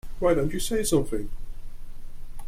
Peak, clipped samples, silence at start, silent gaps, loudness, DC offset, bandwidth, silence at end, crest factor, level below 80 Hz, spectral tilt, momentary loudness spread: -10 dBFS; under 0.1%; 0.05 s; none; -26 LUFS; under 0.1%; 15.5 kHz; 0 s; 16 dB; -34 dBFS; -5 dB/octave; 23 LU